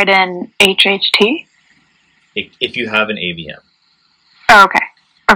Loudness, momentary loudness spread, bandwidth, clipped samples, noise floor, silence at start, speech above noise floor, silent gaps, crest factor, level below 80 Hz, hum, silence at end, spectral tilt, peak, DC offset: -12 LUFS; 17 LU; over 20 kHz; 0.6%; -57 dBFS; 0 s; 44 dB; none; 14 dB; -48 dBFS; none; 0 s; -3 dB/octave; 0 dBFS; under 0.1%